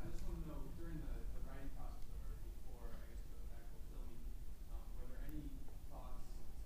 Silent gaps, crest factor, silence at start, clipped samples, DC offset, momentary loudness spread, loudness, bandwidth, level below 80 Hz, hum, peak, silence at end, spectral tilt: none; 12 dB; 0 s; under 0.1%; under 0.1%; 6 LU; -54 LUFS; 15.5 kHz; -48 dBFS; none; -32 dBFS; 0 s; -6.5 dB/octave